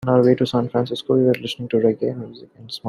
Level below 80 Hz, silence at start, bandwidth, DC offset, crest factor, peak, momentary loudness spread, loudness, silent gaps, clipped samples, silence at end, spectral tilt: -60 dBFS; 0 s; 13 kHz; under 0.1%; 16 dB; -4 dBFS; 15 LU; -20 LUFS; none; under 0.1%; 0 s; -7.5 dB/octave